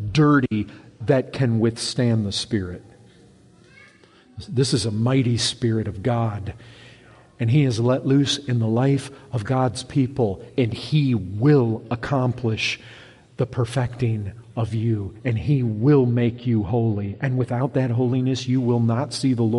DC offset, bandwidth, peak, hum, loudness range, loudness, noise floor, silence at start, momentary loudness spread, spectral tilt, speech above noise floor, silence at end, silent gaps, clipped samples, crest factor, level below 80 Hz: under 0.1%; 11.5 kHz; -6 dBFS; none; 4 LU; -22 LUFS; -52 dBFS; 0 s; 9 LU; -6.5 dB/octave; 31 dB; 0 s; none; under 0.1%; 16 dB; -52 dBFS